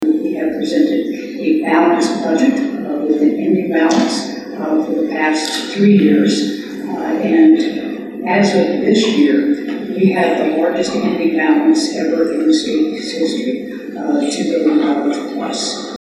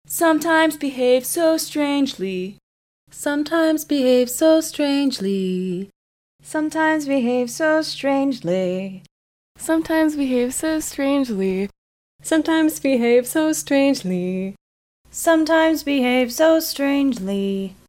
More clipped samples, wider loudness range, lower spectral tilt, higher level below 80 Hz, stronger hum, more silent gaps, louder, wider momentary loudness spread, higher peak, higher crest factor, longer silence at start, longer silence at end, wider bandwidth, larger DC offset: neither; about the same, 3 LU vs 3 LU; about the same, -5 dB/octave vs -4.5 dB/octave; about the same, -58 dBFS vs -56 dBFS; neither; second, none vs 2.63-3.07 s, 5.96-6.39 s, 9.11-9.55 s, 11.78-12.19 s, 14.61-15.05 s; first, -15 LUFS vs -19 LUFS; about the same, 9 LU vs 10 LU; first, -2 dBFS vs -6 dBFS; about the same, 12 dB vs 14 dB; about the same, 0 s vs 0.1 s; about the same, 0.05 s vs 0.15 s; second, 12 kHz vs 16.5 kHz; neither